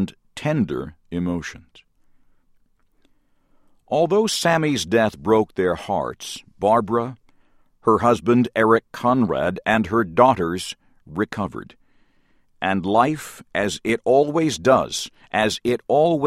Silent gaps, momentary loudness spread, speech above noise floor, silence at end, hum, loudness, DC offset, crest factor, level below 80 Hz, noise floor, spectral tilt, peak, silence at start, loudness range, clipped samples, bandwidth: none; 12 LU; 40 dB; 0 s; none; -21 LUFS; under 0.1%; 20 dB; -52 dBFS; -60 dBFS; -5 dB/octave; 0 dBFS; 0 s; 7 LU; under 0.1%; 15.5 kHz